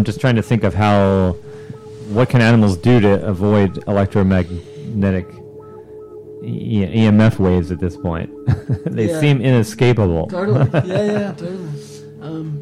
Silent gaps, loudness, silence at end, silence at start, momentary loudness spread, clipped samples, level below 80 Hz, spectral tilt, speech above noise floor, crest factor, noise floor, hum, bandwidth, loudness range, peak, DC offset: none; -16 LUFS; 0 s; 0 s; 21 LU; under 0.1%; -40 dBFS; -8 dB/octave; 21 dB; 12 dB; -36 dBFS; none; 12.5 kHz; 4 LU; -6 dBFS; under 0.1%